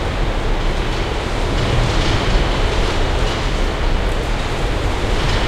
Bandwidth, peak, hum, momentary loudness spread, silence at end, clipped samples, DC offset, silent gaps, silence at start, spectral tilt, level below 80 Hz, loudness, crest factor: 11.5 kHz; -4 dBFS; none; 4 LU; 0 s; under 0.1%; under 0.1%; none; 0 s; -5 dB/octave; -20 dBFS; -20 LUFS; 14 dB